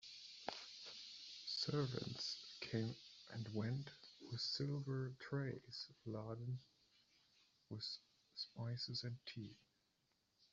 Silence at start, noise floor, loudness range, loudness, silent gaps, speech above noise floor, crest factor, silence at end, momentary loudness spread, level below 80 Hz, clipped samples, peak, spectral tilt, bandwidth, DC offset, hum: 0 s; -83 dBFS; 5 LU; -47 LUFS; none; 37 dB; 22 dB; 0.05 s; 11 LU; -80 dBFS; under 0.1%; -26 dBFS; -4.5 dB/octave; 7.8 kHz; under 0.1%; none